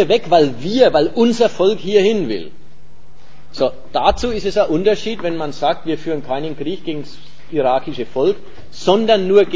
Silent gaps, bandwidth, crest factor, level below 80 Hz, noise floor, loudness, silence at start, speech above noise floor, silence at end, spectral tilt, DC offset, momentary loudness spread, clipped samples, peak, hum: none; 8 kHz; 18 dB; -42 dBFS; -47 dBFS; -17 LUFS; 0 s; 31 dB; 0 s; -5.5 dB/octave; 6%; 11 LU; under 0.1%; 0 dBFS; none